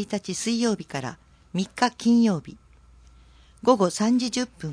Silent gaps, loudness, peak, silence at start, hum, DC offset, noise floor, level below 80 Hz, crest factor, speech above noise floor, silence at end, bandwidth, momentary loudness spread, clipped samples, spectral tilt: none; -24 LUFS; -4 dBFS; 0 s; none; under 0.1%; -53 dBFS; -56 dBFS; 20 dB; 29 dB; 0 s; 10.5 kHz; 12 LU; under 0.1%; -5 dB/octave